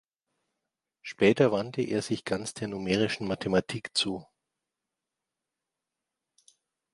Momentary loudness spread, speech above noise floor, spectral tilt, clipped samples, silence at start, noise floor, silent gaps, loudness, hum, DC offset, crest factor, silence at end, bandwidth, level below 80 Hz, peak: 11 LU; 60 dB; -5 dB/octave; under 0.1%; 1.05 s; -88 dBFS; none; -28 LUFS; none; under 0.1%; 24 dB; 2.7 s; 11.5 kHz; -62 dBFS; -8 dBFS